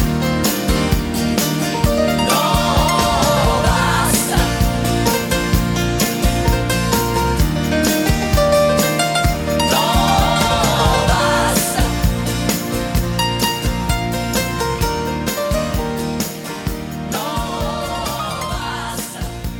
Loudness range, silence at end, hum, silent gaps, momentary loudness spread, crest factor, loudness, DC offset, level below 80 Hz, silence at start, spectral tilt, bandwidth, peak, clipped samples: 6 LU; 0 s; none; none; 8 LU; 16 dB; -17 LUFS; under 0.1%; -24 dBFS; 0 s; -4.5 dB/octave; 20 kHz; 0 dBFS; under 0.1%